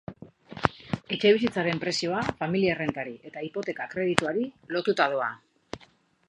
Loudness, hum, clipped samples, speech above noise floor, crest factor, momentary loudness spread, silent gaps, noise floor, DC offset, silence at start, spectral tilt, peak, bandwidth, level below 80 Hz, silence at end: -27 LUFS; none; under 0.1%; 33 dB; 28 dB; 20 LU; none; -60 dBFS; under 0.1%; 0.1 s; -5 dB/octave; 0 dBFS; 11 kHz; -58 dBFS; 0.45 s